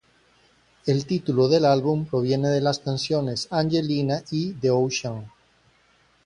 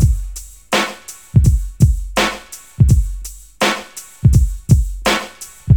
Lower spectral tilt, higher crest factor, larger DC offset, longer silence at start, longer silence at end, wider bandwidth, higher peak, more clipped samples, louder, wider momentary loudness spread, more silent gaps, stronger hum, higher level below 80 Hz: about the same, -6 dB/octave vs -5.5 dB/octave; about the same, 18 dB vs 16 dB; second, under 0.1% vs 0.3%; first, 0.85 s vs 0 s; first, 0.95 s vs 0 s; second, 11 kHz vs 19 kHz; second, -6 dBFS vs 0 dBFS; neither; second, -23 LUFS vs -16 LUFS; second, 8 LU vs 17 LU; neither; neither; second, -58 dBFS vs -20 dBFS